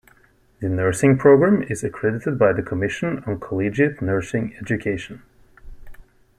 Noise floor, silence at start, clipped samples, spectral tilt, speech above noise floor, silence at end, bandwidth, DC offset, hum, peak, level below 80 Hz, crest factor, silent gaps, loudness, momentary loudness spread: -56 dBFS; 0.6 s; under 0.1%; -7 dB/octave; 36 dB; 0.35 s; 13.5 kHz; under 0.1%; none; -2 dBFS; -48 dBFS; 18 dB; none; -20 LUFS; 12 LU